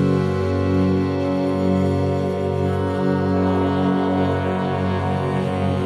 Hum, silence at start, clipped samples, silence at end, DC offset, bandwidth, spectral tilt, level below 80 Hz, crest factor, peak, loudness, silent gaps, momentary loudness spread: none; 0 s; under 0.1%; 0 s; under 0.1%; 11 kHz; -8.5 dB/octave; -48 dBFS; 12 dB; -8 dBFS; -20 LUFS; none; 3 LU